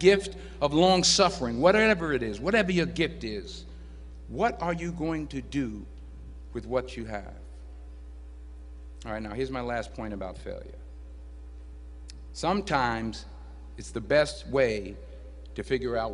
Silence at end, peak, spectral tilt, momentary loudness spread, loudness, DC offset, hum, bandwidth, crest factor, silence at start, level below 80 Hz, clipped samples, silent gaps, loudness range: 0 s; -6 dBFS; -4 dB/octave; 24 LU; -27 LUFS; under 0.1%; none; 10.5 kHz; 22 dB; 0 s; -44 dBFS; under 0.1%; none; 13 LU